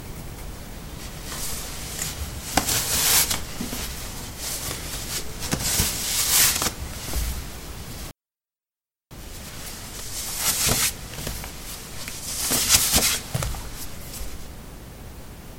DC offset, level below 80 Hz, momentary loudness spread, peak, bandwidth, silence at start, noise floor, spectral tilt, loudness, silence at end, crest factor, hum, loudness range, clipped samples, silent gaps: under 0.1%; -38 dBFS; 21 LU; -2 dBFS; 17 kHz; 0 s; under -90 dBFS; -1.5 dB/octave; -23 LUFS; 0 s; 26 dB; none; 6 LU; under 0.1%; none